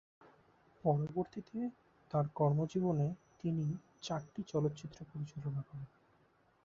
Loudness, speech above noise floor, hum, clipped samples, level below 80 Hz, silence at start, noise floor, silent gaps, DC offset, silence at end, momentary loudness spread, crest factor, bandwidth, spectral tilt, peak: -38 LUFS; 34 dB; none; under 0.1%; -70 dBFS; 0.85 s; -71 dBFS; none; under 0.1%; 0.8 s; 13 LU; 18 dB; 7.4 kHz; -8.5 dB/octave; -20 dBFS